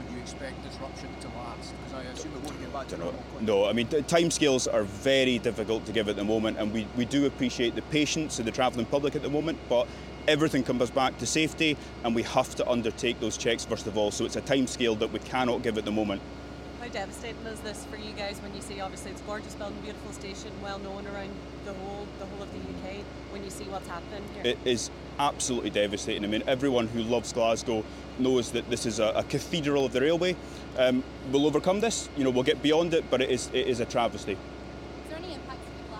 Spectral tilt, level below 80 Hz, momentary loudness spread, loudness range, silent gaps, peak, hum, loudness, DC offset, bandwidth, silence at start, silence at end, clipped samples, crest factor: -4 dB/octave; -48 dBFS; 14 LU; 11 LU; none; -10 dBFS; none; -29 LUFS; under 0.1%; 16.5 kHz; 0 s; 0 s; under 0.1%; 20 dB